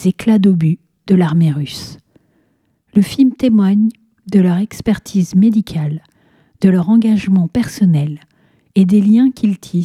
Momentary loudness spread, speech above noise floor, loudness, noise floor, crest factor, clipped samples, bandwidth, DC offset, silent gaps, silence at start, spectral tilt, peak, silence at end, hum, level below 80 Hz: 10 LU; 48 dB; -14 LUFS; -61 dBFS; 14 dB; under 0.1%; 13 kHz; under 0.1%; none; 0 s; -8 dB/octave; 0 dBFS; 0 s; none; -48 dBFS